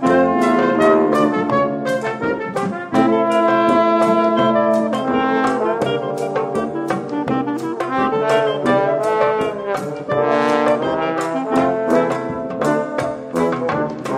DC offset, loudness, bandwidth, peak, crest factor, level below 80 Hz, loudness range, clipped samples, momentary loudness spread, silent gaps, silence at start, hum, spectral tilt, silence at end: under 0.1%; -18 LUFS; 14.5 kHz; 0 dBFS; 16 dB; -54 dBFS; 3 LU; under 0.1%; 8 LU; none; 0 s; none; -6 dB/octave; 0 s